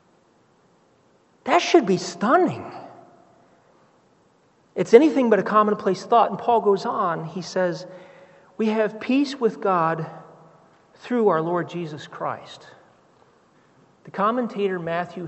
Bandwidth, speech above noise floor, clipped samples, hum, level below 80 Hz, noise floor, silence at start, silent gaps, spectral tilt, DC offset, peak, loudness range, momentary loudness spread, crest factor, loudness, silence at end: 8.2 kHz; 39 dB; under 0.1%; none; -74 dBFS; -60 dBFS; 1.45 s; none; -6 dB/octave; under 0.1%; 0 dBFS; 8 LU; 17 LU; 24 dB; -21 LUFS; 0 s